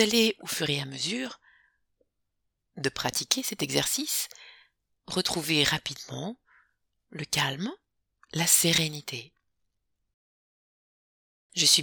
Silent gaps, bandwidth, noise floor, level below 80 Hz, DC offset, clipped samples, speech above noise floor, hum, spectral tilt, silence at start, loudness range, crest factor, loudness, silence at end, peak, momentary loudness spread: 10.14-11.50 s; 19 kHz; -80 dBFS; -64 dBFS; under 0.1%; under 0.1%; 52 dB; none; -2 dB/octave; 0 s; 3 LU; 26 dB; -27 LUFS; 0 s; -6 dBFS; 16 LU